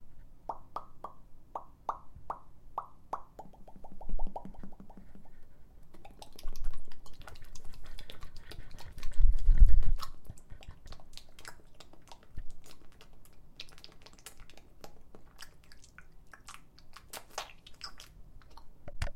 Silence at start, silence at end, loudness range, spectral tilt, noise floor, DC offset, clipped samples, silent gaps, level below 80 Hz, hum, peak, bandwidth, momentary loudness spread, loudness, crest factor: 0 s; 0.05 s; 18 LU; -5 dB/octave; -51 dBFS; under 0.1%; under 0.1%; none; -34 dBFS; none; -8 dBFS; 8.6 kHz; 18 LU; -40 LUFS; 22 dB